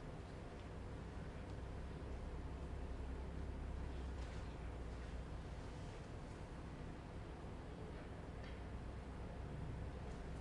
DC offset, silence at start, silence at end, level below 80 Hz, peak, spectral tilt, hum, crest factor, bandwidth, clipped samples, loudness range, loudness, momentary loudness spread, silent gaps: under 0.1%; 0 s; 0 s; -52 dBFS; -36 dBFS; -7 dB/octave; none; 14 dB; 11 kHz; under 0.1%; 2 LU; -51 LUFS; 3 LU; none